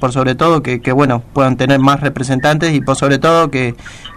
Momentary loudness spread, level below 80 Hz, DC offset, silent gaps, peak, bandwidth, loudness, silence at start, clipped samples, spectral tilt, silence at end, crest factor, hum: 5 LU; -38 dBFS; under 0.1%; none; 0 dBFS; 15 kHz; -13 LUFS; 0 s; under 0.1%; -6 dB/octave; 0 s; 12 dB; none